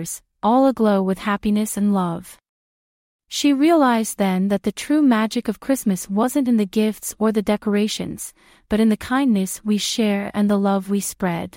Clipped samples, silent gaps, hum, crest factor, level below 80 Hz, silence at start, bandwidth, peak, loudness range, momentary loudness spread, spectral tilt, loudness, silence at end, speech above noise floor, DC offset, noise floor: under 0.1%; 2.49-3.19 s; none; 14 dB; -52 dBFS; 0 s; 16.5 kHz; -6 dBFS; 2 LU; 8 LU; -5 dB/octave; -20 LUFS; 0 s; over 71 dB; under 0.1%; under -90 dBFS